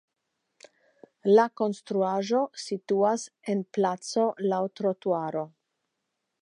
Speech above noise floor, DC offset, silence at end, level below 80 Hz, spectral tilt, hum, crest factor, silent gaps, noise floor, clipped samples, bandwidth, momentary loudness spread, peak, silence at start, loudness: 55 dB; under 0.1%; 0.95 s; -84 dBFS; -5.5 dB/octave; none; 20 dB; none; -82 dBFS; under 0.1%; 10.5 kHz; 11 LU; -8 dBFS; 0.65 s; -27 LUFS